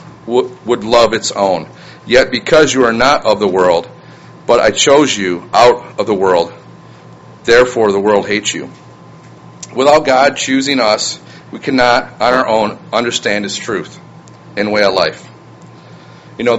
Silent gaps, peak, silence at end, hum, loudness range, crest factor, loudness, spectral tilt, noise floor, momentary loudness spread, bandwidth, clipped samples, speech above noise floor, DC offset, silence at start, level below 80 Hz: none; 0 dBFS; 0 s; none; 4 LU; 14 dB; -12 LUFS; -3.5 dB/octave; -37 dBFS; 14 LU; 9.4 kHz; 0.2%; 25 dB; under 0.1%; 0 s; -44 dBFS